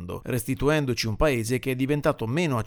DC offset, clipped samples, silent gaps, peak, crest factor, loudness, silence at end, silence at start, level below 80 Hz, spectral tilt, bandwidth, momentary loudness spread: under 0.1%; under 0.1%; none; -8 dBFS; 16 dB; -25 LUFS; 0 s; 0 s; -40 dBFS; -5.5 dB/octave; over 20 kHz; 5 LU